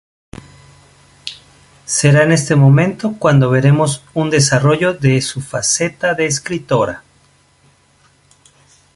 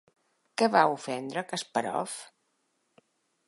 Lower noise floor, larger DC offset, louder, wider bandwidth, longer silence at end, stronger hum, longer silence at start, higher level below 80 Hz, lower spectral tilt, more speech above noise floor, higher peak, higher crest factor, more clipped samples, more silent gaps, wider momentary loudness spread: second, -53 dBFS vs -75 dBFS; neither; first, -14 LUFS vs -29 LUFS; about the same, 11.5 kHz vs 11.5 kHz; first, 1.95 s vs 1.25 s; neither; first, 1.25 s vs 0.6 s; first, -48 dBFS vs -82 dBFS; first, -5 dB/octave vs -3.5 dB/octave; second, 40 dB vs 47 dB; first, 0 dBFS vs -8 dBFS; second, 14 dB vs 24 dB; neither; neither; second, 12 LU vs 15 LU